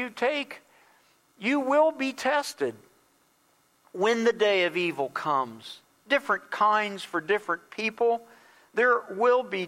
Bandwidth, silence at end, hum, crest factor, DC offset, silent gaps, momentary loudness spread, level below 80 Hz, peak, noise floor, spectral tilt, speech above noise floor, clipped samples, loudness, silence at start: 15.5 kHz; 0 s; none; 18 dB; under 0.1%; none; 10 LU; -78 dBFS; -10 dBFS; -66 dBFS; -4 dB/octave; 40 dB; under 0.1%; -26 LUFS; 0 s